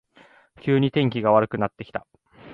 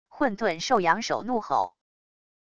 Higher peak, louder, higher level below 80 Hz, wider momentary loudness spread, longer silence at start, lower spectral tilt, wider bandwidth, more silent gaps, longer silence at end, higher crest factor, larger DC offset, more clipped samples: first, -4 dBFS vs -8 dBFS; first, -22 LUFS vs -26 LUFS; about the same, -58 dBFS vs -62 dBFS; first, 15 LU vs 6 LU; first, 0.65 s vs 0.05 s; first, -9.5 dB/octave vs -4 dB/octave; second, 5.2 kHz vs 10 kHz; neither; second, 0 s vs 0.65 s; about the same, 20 dB vs 20 dB; neither; neither